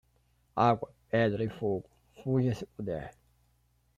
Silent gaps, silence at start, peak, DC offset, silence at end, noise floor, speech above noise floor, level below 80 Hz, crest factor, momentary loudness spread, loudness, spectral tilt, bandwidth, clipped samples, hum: none; 0.55 s; -12 dBFS; under 0.1%; 0.85 s; -70 dBFS; 40 dB; -62 dBFS; 20 dB; 12 LU; -32 LUFS; -8 dB/octave; 9.8 kHz; under 0.1%; none